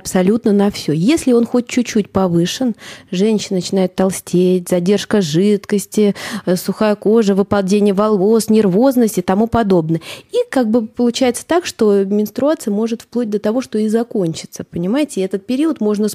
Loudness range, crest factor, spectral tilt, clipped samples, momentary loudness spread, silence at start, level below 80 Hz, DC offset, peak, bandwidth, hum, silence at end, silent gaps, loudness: 4 LU; 12 dB; -6 dB/octave; under 0.1%; 7 LU; 0.05 s; -50 dBFS; under 0.1%; -2 dBFS; 16 kHz; none; 0 s; none; -15 LUFS